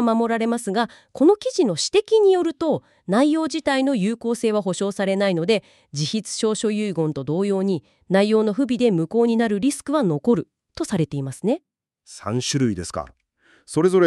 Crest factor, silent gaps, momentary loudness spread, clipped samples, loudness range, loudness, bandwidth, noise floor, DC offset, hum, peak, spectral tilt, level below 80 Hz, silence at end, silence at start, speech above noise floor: 16 dB; none; 9 LU; under 0.1%; 4 LU; -21 LUFS; 12.5 kHz; -59 dBFS; under 0.1%; none; -4 dBFS; -5.5 dB/octave; -58 dBFS; 0 s; 0 s; 39 dB